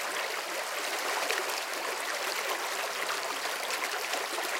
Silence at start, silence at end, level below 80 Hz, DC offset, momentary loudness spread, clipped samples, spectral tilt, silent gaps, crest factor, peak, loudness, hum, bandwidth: 0 s; 0 s; -88 dBFS; under 0.1%; 3 LU; under 0.1%; 1 dB/octave; none; 20 dB; -14 dBFS; -31 LUFS; none; 17 kHz